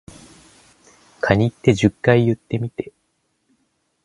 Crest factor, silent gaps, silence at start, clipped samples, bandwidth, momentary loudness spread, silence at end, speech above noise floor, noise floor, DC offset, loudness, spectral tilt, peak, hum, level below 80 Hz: 22 dB; none; 1.25 s; under 0.1%; 11.5 kHz; 13 LU; 1.15 s; 51 dB; -69 dBFS; under 0.1%; -19 LUFS; -7 dB/octave; 0 dBFS; none; -46 dBFS